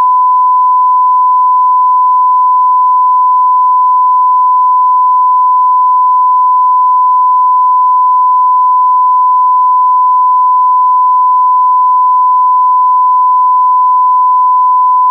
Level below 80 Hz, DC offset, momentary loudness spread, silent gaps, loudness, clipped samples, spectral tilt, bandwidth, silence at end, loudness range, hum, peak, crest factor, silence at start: under -90 dBFS; under 0.1%; 0 LU; none; -7 LUFS; under 0.1%; -3.5 dB/octave; 1.2 kHz; 0 s; 0 LU; none; -4 dBFS; 4 dB; 0 s